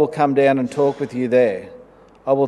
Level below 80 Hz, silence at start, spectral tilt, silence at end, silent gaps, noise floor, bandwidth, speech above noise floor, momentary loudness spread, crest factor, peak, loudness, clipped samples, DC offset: -60 dBFS; 0 s; -7.5 dB/octave; 0 s; none; -46 dBFS; 11 kHz; 28 dB; 10 LU; 16 dB; -2 dBFS; -18 LUFS; under 0.1%; under 0.1%